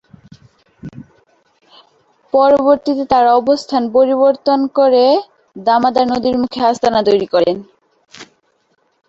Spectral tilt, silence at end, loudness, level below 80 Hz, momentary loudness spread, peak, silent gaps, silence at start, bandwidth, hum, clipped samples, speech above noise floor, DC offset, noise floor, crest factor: -5.5 dB/octave; 0.85 s; -13 LUFS; -54 dBFS; 8 LU; -2 dBFS; none; 0.85 s; 7.8 kHz; none; under 0.1%; 49 dB; under 0.1%; -61 dBFS; 14 dB